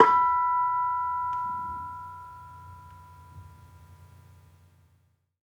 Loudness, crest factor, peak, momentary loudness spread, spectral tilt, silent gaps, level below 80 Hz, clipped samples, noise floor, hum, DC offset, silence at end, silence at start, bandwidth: -26 LUFS; 28 dB; -2 dBFS; 26 LU; -5.5 dB/octave; none; -64 dBFS; under 0.1%; -67 dBFS; none; under 0.1%; 1.4 s; 0 s; 7.8 kHz